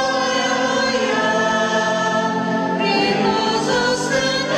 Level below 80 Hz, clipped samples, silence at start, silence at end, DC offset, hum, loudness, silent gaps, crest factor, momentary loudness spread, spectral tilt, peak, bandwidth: -52 dBFS; under 0.1%; 0 s; 0 s; under 0.1%; none; -18 LUFS; none; 12 dB; 2 LU; -3.5 dB/octave; -6 dBFS; 14 kHz